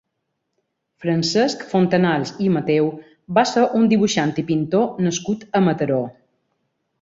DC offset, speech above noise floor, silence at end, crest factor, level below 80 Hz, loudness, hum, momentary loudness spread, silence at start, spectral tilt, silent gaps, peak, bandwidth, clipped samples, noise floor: under 0.1%; 57 dB; 0.9 s; 18 dB; -60 dBFS; -19 LUFS; none; 7 LU; 1 s; -5.5 dB/octave; none; -2 dBFS; 7.8 kHz; under 0.1%; -76 dBFS